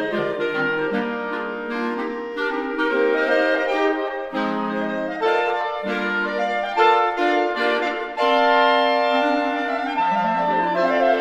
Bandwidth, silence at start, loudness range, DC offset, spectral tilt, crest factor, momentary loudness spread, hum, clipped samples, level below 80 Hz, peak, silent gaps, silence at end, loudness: 9.4 kHz; 0 s; 4 LU; under 0.1%; -5 dB/octave; 16 dB; 8 LU; none; under 0.1%; -60 dBFS; -4 dBFS; none; 0 s; -21 LUFS